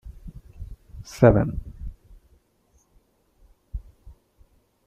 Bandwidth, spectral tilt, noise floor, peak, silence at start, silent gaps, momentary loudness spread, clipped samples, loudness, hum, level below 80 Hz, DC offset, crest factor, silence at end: 13.5 kHz; -8.5 dB/octave; -64 dBFS; -2 dBFS; 0.05 s; none; 27 LU; under 0.1%; -20 LUFS; none; -40 dBFS; under 0.1%; 26 dB; 1.05 s